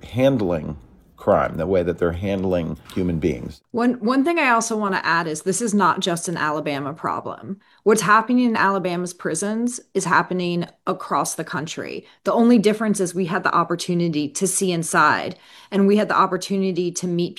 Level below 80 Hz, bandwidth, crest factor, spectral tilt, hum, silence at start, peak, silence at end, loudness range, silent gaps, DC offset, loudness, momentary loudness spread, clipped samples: -52 dBFS; 13.5 kHz; 18 dB; -4.5 dB/octave; none; 0.05 s; -2 dBFS; 0.05 s; 3 LU; none; under 0.1%; -21 LUFS; 11 LU; under 0.1%